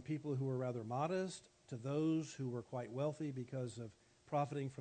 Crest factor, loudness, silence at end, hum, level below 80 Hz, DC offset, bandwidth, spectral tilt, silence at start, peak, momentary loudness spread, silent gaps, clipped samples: 16 dB; -42 LUFS; 0 s; none; -80 dBFS; under 0.1%; 9 kHz; -7 dB/octave; 0 s; -26 dBFS; 9 LU; none; under 0.1%